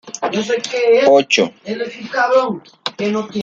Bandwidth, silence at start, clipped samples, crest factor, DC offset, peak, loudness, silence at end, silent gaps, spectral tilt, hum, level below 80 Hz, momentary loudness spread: 7.8 kHz; 0.05 s; under 0.1%; 16 dB; under 0.1%; -2 dBFS; -16 LUFS; 0 s; none; -3.5 dB/octave; none; -66 dBFS; 13 LU